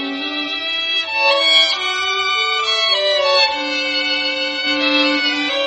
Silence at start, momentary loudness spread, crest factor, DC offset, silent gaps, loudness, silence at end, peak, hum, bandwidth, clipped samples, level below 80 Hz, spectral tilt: 0 s; 7 LU; 16 dB; under 0.1%; none; -15 LUFS; 0 s; -2 dBFS; none; 8.4 kHz; under 0.1%; -60 dBFS; -0.5 dB/octave